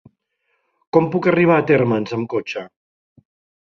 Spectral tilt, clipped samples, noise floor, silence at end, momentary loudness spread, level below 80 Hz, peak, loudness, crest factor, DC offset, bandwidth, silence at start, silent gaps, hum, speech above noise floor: -8 dB/octave; under 0.1%; -70 dBFS; 0.95 s; 11 LU; -60 dBFS; -2 dBFS; -18 LUFS; 18 dB; under 0.1%; 6.8 kHz; 0.95 s; none; none; 53 dB